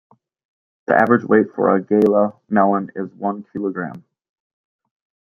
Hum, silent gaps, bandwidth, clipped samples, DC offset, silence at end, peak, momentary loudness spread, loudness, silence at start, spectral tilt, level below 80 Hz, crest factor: none; none; 6 kHz; under 0.1%; under 0.1%; 1.25 s; -2 dBFS; 13 LU; -18 LUFS; 0.9 s; -9.5 dB/octave; -64 dBFS; 18 dB